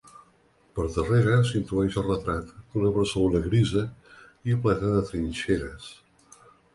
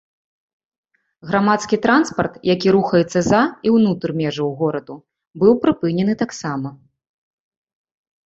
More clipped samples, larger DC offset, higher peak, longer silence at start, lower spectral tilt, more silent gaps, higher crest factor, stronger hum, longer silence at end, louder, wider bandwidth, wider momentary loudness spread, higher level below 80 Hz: neither; neither; second, -8 dBFS vs -2 dBFS; second, 0.75 s vs 1.25 s; about the same, -7 dB/octave vs -6 dB/octave; second, none vs 5.27-5.31 s; about the same, 18 dB vs 18 dB; neither; second, 0.8 s vs 1.5 s; second, -26 LUFS vs -18 LUFS; first, 11.5 kHz vs 8 kHz; first, 12 LU vs 9 LU; first, -42 dBFS vs -54 dBFS